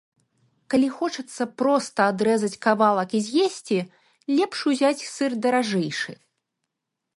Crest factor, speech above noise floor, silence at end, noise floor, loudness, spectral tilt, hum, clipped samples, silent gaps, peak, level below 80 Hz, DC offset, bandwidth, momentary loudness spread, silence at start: 18 dB; 60 dB; 1 s; -83 dBFS; -23 LUFS; -4.5 dB/octave; none; under 0.1%; none; -6 dBFS; -72 dBFS; under 0.1%; 11.5 kHz; 9 LU; 0.7 s